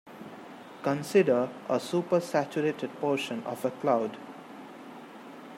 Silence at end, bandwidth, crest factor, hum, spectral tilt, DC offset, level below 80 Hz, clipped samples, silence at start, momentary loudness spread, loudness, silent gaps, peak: 0 s; 16 kHz; 20 dB; none; -6 dB/octave; under 0.1%; -80 dBFS; under 0.1%; 0.05 s; 20 LU; -29 LUFS; none; -10 dBFS